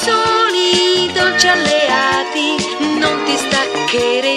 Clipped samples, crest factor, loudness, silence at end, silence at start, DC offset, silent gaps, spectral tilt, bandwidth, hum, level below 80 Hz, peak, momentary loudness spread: under 0.1%; 14 dB; -13 LUFS; 0 s; 0 s; under 0.1%; none; -2 dB/octave; 14 kHz; none; -50 dBFS; 0 dBFS; 5 LU